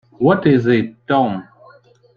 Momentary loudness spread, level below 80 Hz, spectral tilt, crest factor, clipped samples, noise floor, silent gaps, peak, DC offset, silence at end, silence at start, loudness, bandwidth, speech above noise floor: 7 LU; -54 dBFS; -9 dB/octave; 16 dB; under 0.1%; -48 dBFS; none; -2 dBFS; under 0.1%; 0.75 s; 0.2 s; -16 LUFS; 6.8 kHz; 33 dB